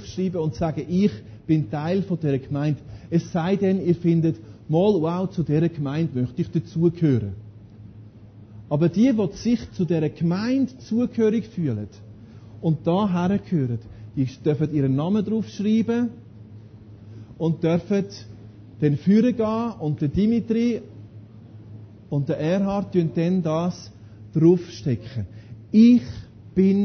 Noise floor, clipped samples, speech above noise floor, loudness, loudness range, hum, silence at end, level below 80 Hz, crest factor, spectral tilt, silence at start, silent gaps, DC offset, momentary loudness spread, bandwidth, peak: -45 dBFS; under 0.1%; 23 dB; -23 LUFS; 3 LU; none; 0 s; -50 dBFS; 16 dB; -8.5 dB/octave; 0 s; none; under 0.1%; 15 LU; 6.6 kHz; -6 dBFS